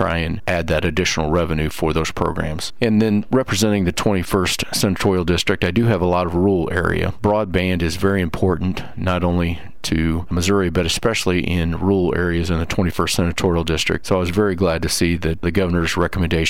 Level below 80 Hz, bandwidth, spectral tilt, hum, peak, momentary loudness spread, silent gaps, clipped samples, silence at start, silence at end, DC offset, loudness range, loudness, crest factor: -34 dBFS; 16.5 kHz; -5 dB/octave; none; -6 dBFS; 4 LU; none; under 0.1%; 0 s; 0 s; 3%; 2 LU; -19 LUFS; 14 dB